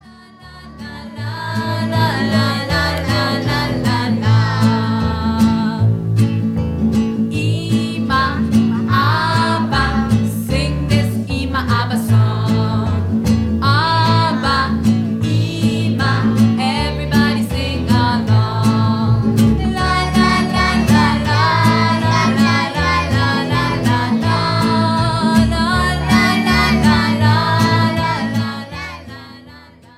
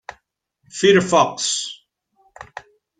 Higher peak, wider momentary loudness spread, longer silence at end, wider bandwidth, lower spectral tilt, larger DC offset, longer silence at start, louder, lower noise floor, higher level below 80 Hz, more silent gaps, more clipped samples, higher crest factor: about the same, -2 dBFS vs -2 dBFS; second, 6 LU vs 26 LU; about the same, 0.4 s vs 0.4 s; first, 14.5 kHz vs 9.6 kHz; first, -6 dB/octave vs -3.5 dB/octave; neither; second, 0.05 s vs 0.75 s; about the same, -15 LUFS vs -17 LUFS; second, -41 dBFS vs -68 dBFS; first, -30 dBFS vs -60 dBFS; neither; neither; second, 14 dB vs 20 dB